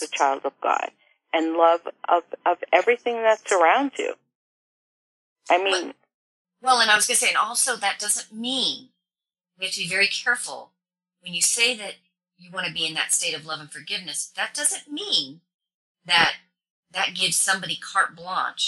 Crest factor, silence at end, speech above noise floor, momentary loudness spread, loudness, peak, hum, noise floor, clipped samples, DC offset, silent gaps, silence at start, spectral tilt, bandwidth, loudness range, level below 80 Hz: 22 dB; 0 s; over 67 dB; 13 LU; -22 LUFS; -4 dBFS; none; under -90 dBFS; under 0.1%; under 0.1%; 4.35-5.36 s, 6.14-6.45 s, 15.54-15.59 s, 15.74-15.95 s, 16.70-16.83 s; 0 s; -0.5 dB/octave; 13.5 kHz; 4 LU; -70 dBFS